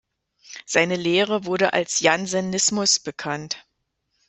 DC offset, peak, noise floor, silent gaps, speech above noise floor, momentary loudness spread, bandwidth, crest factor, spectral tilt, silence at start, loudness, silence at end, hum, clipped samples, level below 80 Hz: under 0.1%; -2 dBFS; -74 dBFS; none; 52 dB; 12 LU; 8.4 kHz; 20 dB; -2.5 dB/octave; 0.5 s; -21 LUFS; 0.7 s; none; under 0.1%; -64 dBFS